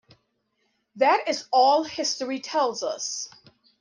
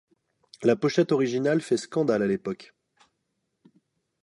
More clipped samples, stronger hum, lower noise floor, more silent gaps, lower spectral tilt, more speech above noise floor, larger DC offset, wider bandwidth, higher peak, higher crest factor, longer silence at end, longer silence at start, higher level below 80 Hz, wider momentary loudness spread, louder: neither; neither; second, -73 dBFS vs -78 dBFS; neither; second, -1 dB/octave vs -6 dB/octave; second, 49 dB vs 54 dB; neither; about the same, 10.5 kHz vs 11.5 kHz; about the same, -8 dBFS vs -8 dBFS; about the same, 18 dB vs 20 dB; second, 0.55 s vs 1.6 s; first, 0.95 s vs 0.6 s; second, -76 dBFS vs -70 dBFS; first, 10 LU vs 7 LU; about the same, -24 LUFS vs -25 LUFS